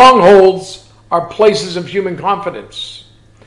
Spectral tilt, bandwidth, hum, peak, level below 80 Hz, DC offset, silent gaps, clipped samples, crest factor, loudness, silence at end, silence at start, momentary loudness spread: -5 dB/octave; 11.5 kHz; none; 0 dBFS; -46 dBFS; under 0.1%; none; 0.2%; 12 dB; -11 LUFS; 0.5 s; 0 s; 19 LU